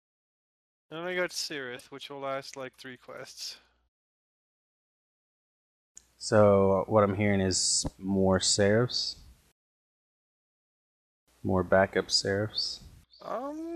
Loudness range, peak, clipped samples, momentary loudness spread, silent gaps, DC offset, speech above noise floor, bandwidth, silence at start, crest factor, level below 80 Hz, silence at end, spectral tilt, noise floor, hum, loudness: 17 LU; -10 dBFS; under 0.1%; 19 LU; 3.88-5.95 s, 9.52-11.27 s; under 0.1%; over 62 dB; 14 kHz; 0.9 s; 20 dB; -60 dBFS; 0 s; -4 dB/octave; under -90 dBFS; none; -27 LUFS